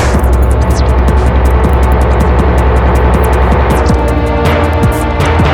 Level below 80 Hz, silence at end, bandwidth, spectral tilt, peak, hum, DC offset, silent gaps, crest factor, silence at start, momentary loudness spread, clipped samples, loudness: -10 dBFS; 0 s; 16 kHz; -7 dB/octave; 0 dBFS; none; under 0.1%; none; 8 dB; 0 s; 2 LU; under 0.1%; -10 LUFS